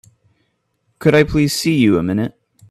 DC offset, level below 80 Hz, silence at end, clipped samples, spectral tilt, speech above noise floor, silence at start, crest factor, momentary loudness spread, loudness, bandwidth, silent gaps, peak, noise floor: under 0.1%; -40 dBFS; 0.4 s; under 0.1%; -5.5 dB/octave; 52 dB; 1 s; 18 dB; 8 LU; -16 LUFS; 15 kHz; none; 0 dBFS; -66 dBFS